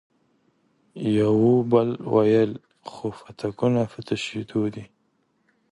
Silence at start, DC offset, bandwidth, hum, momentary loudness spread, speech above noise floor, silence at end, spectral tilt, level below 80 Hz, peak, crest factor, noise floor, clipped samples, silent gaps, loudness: 0.95 s; under 0.1%; 11 kHz; none; 15 LU; 46 dB; 0.85 s; -7.5 dB/octave; -62 dBFS; -6 dBFS; 18 dB; -69 dBFS; under 0.1%; none; -23 LUFS